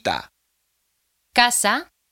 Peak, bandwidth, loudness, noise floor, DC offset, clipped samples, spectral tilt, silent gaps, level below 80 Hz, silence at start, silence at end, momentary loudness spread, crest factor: 0 dBFS; 17 kHz; -19 LUFS; -71 dBFS; under 0.1%; under 0.1%; -0.5 dB/octave; none; -58 dBFS; 0.05 s; 0.3 s; 10 LU; 24 dB